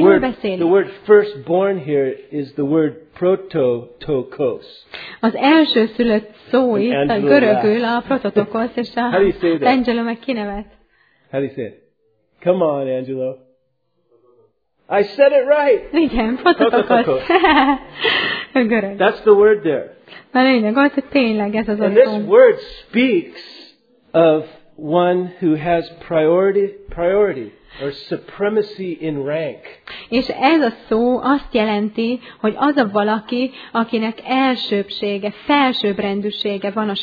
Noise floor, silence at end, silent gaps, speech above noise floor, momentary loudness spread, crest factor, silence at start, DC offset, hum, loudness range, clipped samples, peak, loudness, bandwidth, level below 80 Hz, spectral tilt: -67 dBFS; 0 s; none; 51 dB; 12 LU; 16 dB; 0 s; under 0.1%; none; 7 LU; under 0.1%; 0 dBFS; -17 LUFS; 5 kHz; -46 dBFS; -8 dB/octave